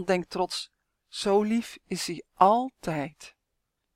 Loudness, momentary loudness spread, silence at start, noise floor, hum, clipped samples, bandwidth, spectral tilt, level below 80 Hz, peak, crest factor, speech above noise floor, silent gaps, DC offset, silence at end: -27 LUFS; 14 LU; 0 s; -80 dBFS; none; under 0.1%; 16.5 kHz; -4.5 dB/octave; -62 dBFS; -6 dBFS; 22 dB; 53 dB; none; under 0.1%; 0.65 s